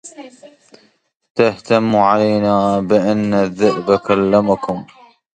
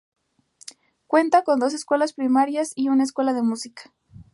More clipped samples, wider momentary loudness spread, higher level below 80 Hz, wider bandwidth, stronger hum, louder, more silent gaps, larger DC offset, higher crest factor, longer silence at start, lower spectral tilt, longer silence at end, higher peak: neither; second, 7 LU vs 23 LU; first, -52 dBFS vs -68 dBFS; second, 9.2 kHz vs 11.5 kHz; neither; first, -15 LUFS vs -21 LUFS; first, 1.15-1.20 s, 1.30-1.35 s vs none; neither; about the same, 16 dB vs 18 dB; second, 0.05 s vs 1.1 s; first, -7 dB/octave vs -4 dB/octave; first, 0.55 s vs 0.1 s; first, 0 dBFS vs -6 dBFS